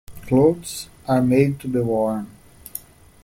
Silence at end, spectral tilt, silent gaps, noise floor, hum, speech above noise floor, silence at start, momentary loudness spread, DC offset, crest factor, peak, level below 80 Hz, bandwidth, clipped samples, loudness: 0.45 s; -7 dB/octave; none; -40 dBFS; none; 20 dB; 0.1 s; 18 LU; under 0.1%; 16 dB; -4 dBFS; -50 dBFS; 16.5 kHz; under 0.1%; -20 LUFS